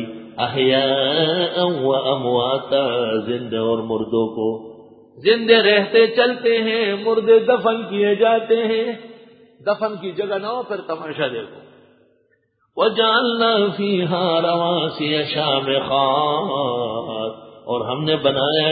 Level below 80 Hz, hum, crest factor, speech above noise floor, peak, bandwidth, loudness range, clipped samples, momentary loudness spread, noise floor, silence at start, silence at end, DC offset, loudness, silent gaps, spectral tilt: -62 dBFS; none; 18 dB; 46 dB; 0 dBFS; 5 kHz; 7 LU; under 0.1%; 12 LU; -64 dBFS; 0 s; 0 s; under 0.1%; -19 LUFS; none; -10 dB/octave